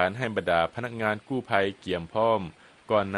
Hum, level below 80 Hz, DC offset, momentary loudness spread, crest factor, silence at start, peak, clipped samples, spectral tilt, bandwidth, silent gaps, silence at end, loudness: none; -58 dBFS; under 0.1%; 6 LU; 20 dB; 0 s; -6 dBFS; under 0.1%; -6.5 dB/octave; 12 kHz; none; 0 s; -27 LUFS